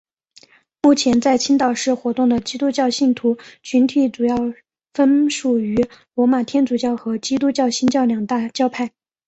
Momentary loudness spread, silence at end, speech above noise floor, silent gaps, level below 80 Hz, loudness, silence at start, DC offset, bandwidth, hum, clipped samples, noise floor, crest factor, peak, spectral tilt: 7 LU; 0.4 s; 34 dB; none; -56 dBFS; -18 LUFS; 0.85 s; under 0.1%; 8.2 kHz; none; under 0.1%; -51 dBFS; 16 dB; -2 dBFS; -4 dB/octave